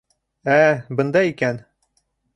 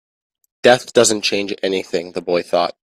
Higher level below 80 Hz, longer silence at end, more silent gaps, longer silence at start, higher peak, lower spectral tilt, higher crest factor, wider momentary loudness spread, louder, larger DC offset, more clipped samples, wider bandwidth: about the same, -62 dBFS vs -60 dBFS; first, 0.75 s vs 0.1 s; neither; second, 0.45 s vs 0.65 s; about the same, -2 dBFS vs 0 dBFS; first, -7 dB/octave vs -2.5 dB/octave; about the same, 18 dB vs 18 dB; first, 12 LU vs 9 LU; about the same, -19 LUFS vs -17 LUFS; neither; neither; second, 10.5 kHz vs 14.5 kHz